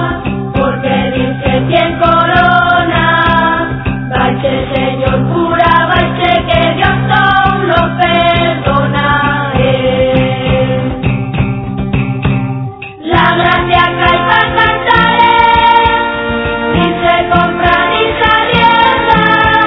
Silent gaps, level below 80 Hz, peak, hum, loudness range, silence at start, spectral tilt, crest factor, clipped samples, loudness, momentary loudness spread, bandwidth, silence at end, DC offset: none; -28 dBFS; 0 dBFS; none; 4 LU; 0 s; -8.5 dB/octave; 10 dB; 0.4%; -10 LUFS; 7 LU; 5.4 kHz; 0 s; under 0.1%